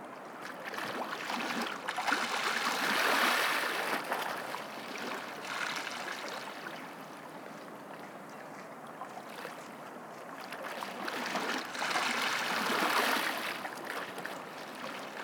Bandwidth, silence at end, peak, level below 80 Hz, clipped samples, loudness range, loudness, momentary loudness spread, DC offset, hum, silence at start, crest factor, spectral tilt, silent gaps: over 20 kHz; 0 s; -16 dBFS; under -90 dBFS; under 0.1%; 14 LU; -34 LUFS; 17 LU; under 0.1%; none; 0 s; 20 dB; -1.5 dB/octave; none